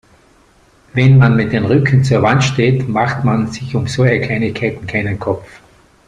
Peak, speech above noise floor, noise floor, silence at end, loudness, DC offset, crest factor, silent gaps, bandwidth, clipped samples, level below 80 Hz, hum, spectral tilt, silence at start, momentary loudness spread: -2 dBFS; 37 dB; -50 dBFS; 0.65 s; -14 LUFS; under 0.1%; 14 dB; none; 9.4 kHz; under 0.1%; -42 dBFS; none; -7 dB/octave; 0.95 s; 10 LU